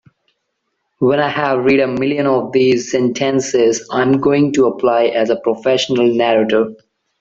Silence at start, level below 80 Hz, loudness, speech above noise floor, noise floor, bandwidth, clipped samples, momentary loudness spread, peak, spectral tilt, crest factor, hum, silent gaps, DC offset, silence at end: 1 s; -56 dBFS; -15 LUFS; 57 dB; -71 dBFS; 7.8 kHz; under 0.1%; 3 LU; -2 dBFS; -5 dB/octave; 14 dB; none; none; under 0.1%; 0.45 s